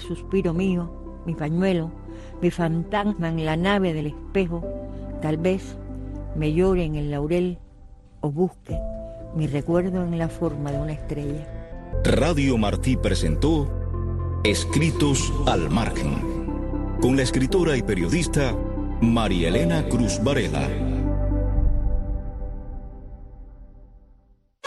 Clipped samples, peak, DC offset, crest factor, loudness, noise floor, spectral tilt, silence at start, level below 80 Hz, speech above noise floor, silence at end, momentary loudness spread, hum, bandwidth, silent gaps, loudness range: under 0.1%; -6 dBFS; under 0.1%; 16 dB; -24 LUFS; -57 dBFS; -6 dB/octave; 0 s; -30 dBFS; 35 dB; 0.7 s; 14 LU; none; 12.5 kHz; none; 5 LU